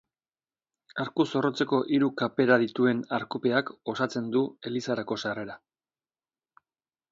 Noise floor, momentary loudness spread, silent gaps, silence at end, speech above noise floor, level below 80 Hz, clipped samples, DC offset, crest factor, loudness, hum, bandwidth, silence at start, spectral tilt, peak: under -90 dBFS; 12 LU; none; 1.55 s; over 63 dB; -72 dBFS; under 0.1%; under 0.1%; 22 dB; -28 LUFS; none; 7.6 kHz; 0.95 s; -6 dB/octave; -6 dBFS